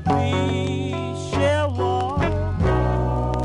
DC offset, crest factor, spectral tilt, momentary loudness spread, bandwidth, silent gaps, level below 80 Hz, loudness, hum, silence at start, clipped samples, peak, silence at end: under 0.1%; 12 dB; -7 dB/octave; 5 LU; 11 kHz; none; -30 dBFS; -22 LUFS; none; 0 s; under 0.1%; -8 dBFS; 0 s